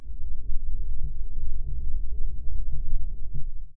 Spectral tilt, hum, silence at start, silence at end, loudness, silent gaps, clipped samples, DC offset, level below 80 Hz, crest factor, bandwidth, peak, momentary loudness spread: -13.5 dB/octave; none; 0 s; 0.05 s; -37 LUFS; none; under 0.1%; under 0.1%; -26 dBFS; 10 dB; 0.5 kHz; -8 dBFS; 4 LU